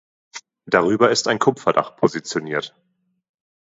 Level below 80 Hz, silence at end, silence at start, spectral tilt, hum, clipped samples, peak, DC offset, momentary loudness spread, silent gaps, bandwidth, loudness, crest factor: -62 dBFS; 0.95 s; 0.35 s; -4 dB/octave; none; under 0.1%; 0 dBFS; under 0.1%; 22 LU; none; 8 kHz; -19 LUFS; 22 dB